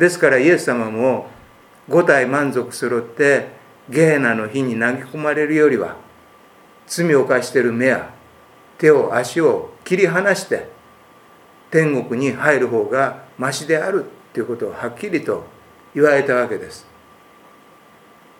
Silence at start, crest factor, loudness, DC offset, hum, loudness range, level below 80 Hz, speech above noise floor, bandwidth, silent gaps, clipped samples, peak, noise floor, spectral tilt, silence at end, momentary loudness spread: 0 s; 18 dB; -18 LUFS; under 0.1%; none; 4 LU; -64 dBFS; 31 dB; 17 kHz; none; under 0.1%; 0 dBFS; -48 dBFS; -5.5 dB/octave; 1.6 s; 12 LU